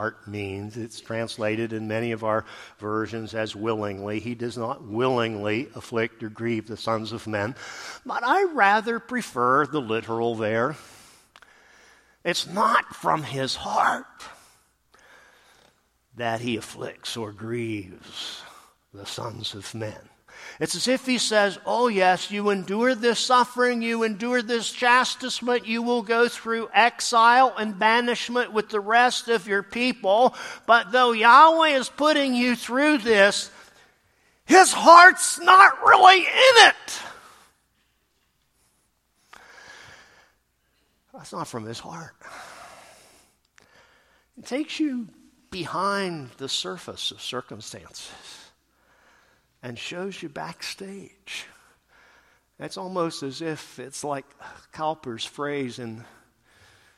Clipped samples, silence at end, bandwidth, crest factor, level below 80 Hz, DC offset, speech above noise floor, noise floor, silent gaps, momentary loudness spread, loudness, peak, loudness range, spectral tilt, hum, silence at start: under 0.1%; 0.95 s; 15 kHz; 24 dB; -66 dBFS; under 0.1%; 47 dB; -69 dBFS; none; 22 LU; -21 LUFS; 0 dBFS; 20 LU; -3 dB/octave; none; 0 s